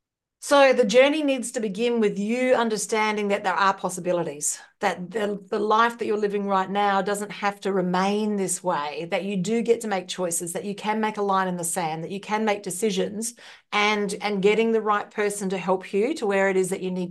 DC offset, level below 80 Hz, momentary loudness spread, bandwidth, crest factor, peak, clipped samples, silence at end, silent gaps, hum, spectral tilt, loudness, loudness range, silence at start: under 0.1%; -74 dBFS; 8 LU; 12.5 kHz; 18 dB; -6 dBFS; under 0.1%; 0 s; none; none; -4 dB/octave; -24 LUFS; 4 LU; 0.4 s